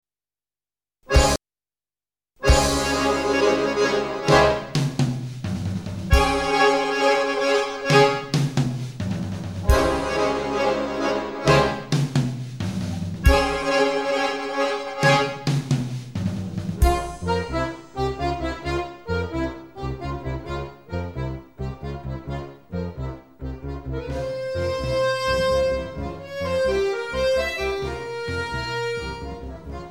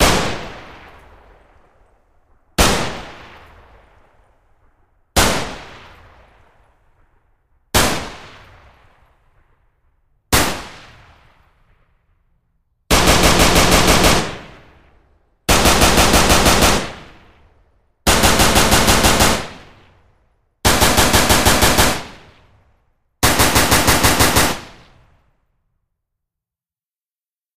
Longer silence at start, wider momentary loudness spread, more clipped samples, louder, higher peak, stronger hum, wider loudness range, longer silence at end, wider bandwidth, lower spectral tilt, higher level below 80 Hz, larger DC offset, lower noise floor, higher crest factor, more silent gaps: first, 1.05 s vs 0 s; second, 13 LU vs 18 LU; neither; second, -23 LUFS vs -13 LUFS; about the same, -2 dBFS vs 0 dBFS; neither; about the same, 10 LU vs 11 LU; about the same, 0 s vs 0 s; about the same, 16.5 kHz vs 16 kHz; first, -5 dB/octave vs -3 dB/octave; about the same, -32 dBFS vs -28 dBFS; first, 0.2% vs under 0.1%; about the same, under -90 dBFS vs under -90 dBFS; about the same, 20 dB vs 18 dB; second, none vs 27.38-27.42 s